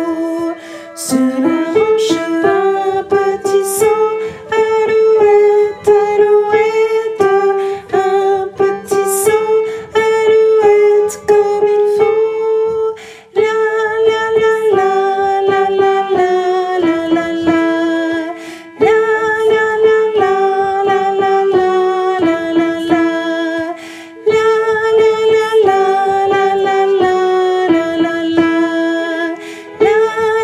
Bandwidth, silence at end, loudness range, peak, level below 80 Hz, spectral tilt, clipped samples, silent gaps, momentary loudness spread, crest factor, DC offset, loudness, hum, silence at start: 14.5 kHz; 0 s; 3 LU; 0 dBFS; -56 dBFS; -4 dB/octave; under 0.1%; none; 7 LU; 12 dB; under 0.1%; -13 LUFS; none; 0 s